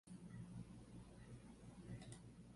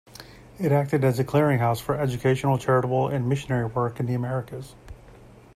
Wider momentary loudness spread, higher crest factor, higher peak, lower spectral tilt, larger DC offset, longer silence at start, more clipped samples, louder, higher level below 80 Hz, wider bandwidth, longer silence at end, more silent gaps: second, 5 LU vs 13 LU; about the same, 18 dB vs 16 dB; second, -40 dBFS vs -8 dBFS; second, -6 dB/octave vs -7.5 dB/octave; neither; second, 0.05 s vs 0.2 s; neither; second, -58 LUFS vs -24 LUFS; second, -68 dBFS vs -52 dBFS; second, 11.5 kHz vs 14.5 kHz; second, 0 s vs 0.3 s; neither